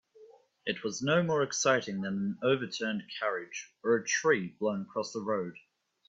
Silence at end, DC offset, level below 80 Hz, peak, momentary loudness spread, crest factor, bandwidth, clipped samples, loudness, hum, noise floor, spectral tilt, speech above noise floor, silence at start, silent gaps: 0.5 s; under 0.1%; -74 dBFS; -12 dBFS; 9 LU; 20 dB; 8 kHz; under 0.1%; -31 LUFS; none; -58 dBFS; -4 dB/octave; 27 dB; 0.2 s; none